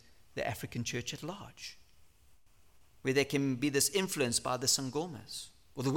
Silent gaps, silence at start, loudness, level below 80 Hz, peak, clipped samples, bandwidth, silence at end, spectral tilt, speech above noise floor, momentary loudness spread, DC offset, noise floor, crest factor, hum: none; 0.35 s; -33 LUFS; -66 dBFS; -16 dBFS; under 0.1%; 17.5 kHz; 0 s; -3.5 dB/octave; 31 dB; 16 LU; under 0.1%; -65 dBFS; 20 dB; none